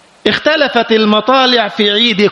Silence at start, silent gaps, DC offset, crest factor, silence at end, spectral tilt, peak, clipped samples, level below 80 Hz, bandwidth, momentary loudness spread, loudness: 0.25 s; none; under 0.1%; 12 dB; 0 s; -4.5 dB/octave; 0 dBFS; under 0.1%; -54 dBFS; 8.2 kHz; 3 LU; -10 LUFS